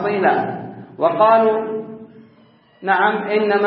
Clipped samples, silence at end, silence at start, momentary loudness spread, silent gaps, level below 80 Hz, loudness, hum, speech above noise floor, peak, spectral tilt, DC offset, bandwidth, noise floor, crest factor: under 0.1%; 0 s; 0 s; 19 LU; none; -70 dBFS; -17 LUFS; none; 35 dB; -2 dBFS; -10.5 dB/octave; under 0.1%; 5 kHz; -51 dBFS; 16 dB